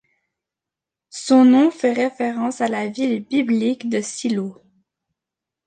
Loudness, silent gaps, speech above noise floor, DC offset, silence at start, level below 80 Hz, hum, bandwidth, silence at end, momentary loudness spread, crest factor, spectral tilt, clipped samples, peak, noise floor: -19 LUFS; none; 69 dB; under 0.1%; 1.15 s; -72 dBFS; none; 9.6 kHz; 1.15 s; 11 LU; 16 dB; -5 dB/octave; under 0.1%; -4 dBFS; -87 dBFS